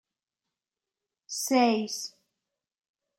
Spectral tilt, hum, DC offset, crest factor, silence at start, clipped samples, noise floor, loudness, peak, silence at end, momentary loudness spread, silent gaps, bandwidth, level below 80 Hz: -3 dB/octave; none; under 0.1%; 22 dB; 1.3 s; under 0.1%; under -90 dBFS; -27 LUFS; -10 dBFS; 1.1 s; 14 LU; none; 16 kHz; -84 dBFS